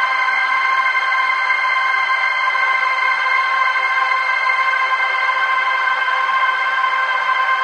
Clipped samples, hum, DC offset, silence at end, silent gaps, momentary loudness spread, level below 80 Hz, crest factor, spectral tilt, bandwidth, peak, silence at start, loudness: under 0.1%; none; under 0.1%; 0 s; none; 1 LU; under -90 dBFS; 14 dB; 1.5 dB/octave; 10 kHz; -4 dBFS; 0 s; -15 LUFS